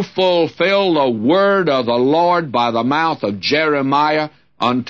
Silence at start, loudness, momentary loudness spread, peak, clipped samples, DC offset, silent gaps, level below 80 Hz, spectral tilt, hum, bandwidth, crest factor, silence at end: 0 s; -15 LUFS; 5 LU; -4 dBFS; under 0.1%; 0.1%; none; -62 dBFS; -6 dB/octave; none; 7.2 kHz; 12 dB; 0 s